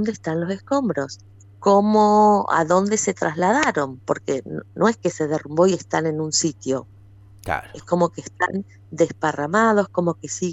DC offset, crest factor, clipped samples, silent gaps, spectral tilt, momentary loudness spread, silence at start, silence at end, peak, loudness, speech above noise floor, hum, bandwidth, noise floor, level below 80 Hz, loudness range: under 0.1%; 16 dB; under 0.1%; none; -5 dB/octave; 12 LU; 0 s; 0 s; -4 dBFS; -21 LUFS; 26 dB; none; 12 kHz; -46 dBFS; -56 dBFS; 6 LU